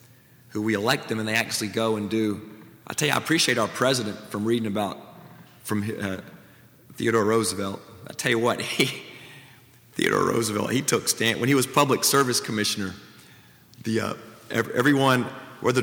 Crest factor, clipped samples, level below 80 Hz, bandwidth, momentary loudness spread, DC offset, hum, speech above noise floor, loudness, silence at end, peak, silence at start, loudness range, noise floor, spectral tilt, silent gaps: 22 dB; under 0.1%; -66 dBFS; over 20 kHz; 16 LU; under 0.1%; none; 29 dB; -24 LUFS; 0 s; -4 dBFS; 0.5 s; 5 LU; -53 dBFS; -3.5 dB/octave; none